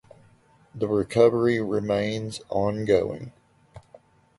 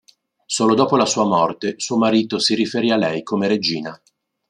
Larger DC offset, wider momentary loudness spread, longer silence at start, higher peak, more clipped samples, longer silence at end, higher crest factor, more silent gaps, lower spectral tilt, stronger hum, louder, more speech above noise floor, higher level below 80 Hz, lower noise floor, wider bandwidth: neither; first, 13 LU vs 7 LU; first, 0.75 s vs 0.5 s; second, -6 dBFS vs -2 dBFS; neither; about the same, 0.6 s vs 0.55 s; about the same, 20 dB vs 18 dB; neither; first, -6.5 dB/octave vs -4 dB/octave; neither; second, -24 LUFS vs -18 LUFS; first, 35 dB vs 23 dB; first, -54 dBFS vs -64 dBFS; first, -58 dBFS vs -41 dBFS; about the same, 11.5 kHz vs 11 kHz